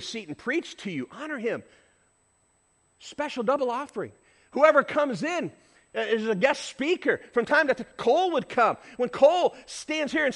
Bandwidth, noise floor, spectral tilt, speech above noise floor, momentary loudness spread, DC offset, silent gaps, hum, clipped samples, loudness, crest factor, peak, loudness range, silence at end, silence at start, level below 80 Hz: 11.5 kHz; -67 dBFS; -4 dB/octave; 42 dB; 15 LU; under 0.1%; none; none; under 0.1%; -26 LUFS; 22 dB; -6 dBFS; 9 LU; 0 s; 0 s; -68 dBFS